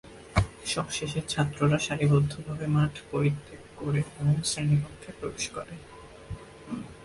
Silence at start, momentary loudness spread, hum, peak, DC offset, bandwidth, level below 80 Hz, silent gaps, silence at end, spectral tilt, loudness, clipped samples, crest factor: 0.05 s; 18 LU; none; -8 dBFS; under 0.1%; 11.5 kHz; -46 dBFS; none; 0 s; -5.5 dB/octave; -28 LUFS; under 0.1%; 20 dB